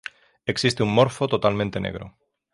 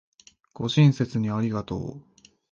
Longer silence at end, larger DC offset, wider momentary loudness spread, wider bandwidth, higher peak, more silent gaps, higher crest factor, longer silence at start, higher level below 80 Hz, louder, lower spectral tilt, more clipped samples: about the same, 0.45 s vs 0.5 s; neither; about the same, 13 LU vs 14 LU; first, 11.5 kHz vs 7.4 kHz; about the same, -4 dBFS vs -6 dBFS; neither; about the same, 20 dB vs 18 dB; second, 0.45 s vs 0.6 s; about the same, -50 dBFS vs -54 dBFS; about the same, -23 LUFS vs -24 LUFS; second, -5.5 dB/octave vs -7 dB/octave; neither